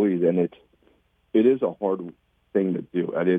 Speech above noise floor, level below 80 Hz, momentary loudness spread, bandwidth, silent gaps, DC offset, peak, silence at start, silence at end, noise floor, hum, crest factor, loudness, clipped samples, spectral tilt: 40 dB; -70 dBFS; 9 LU; 3.7 kHz; none; under 0.1%; -8 dBFS; 0 s; 0 s; -63 dBFS; none; 16 dB; -24 LUFS; under 0.1%; -10 dB/octave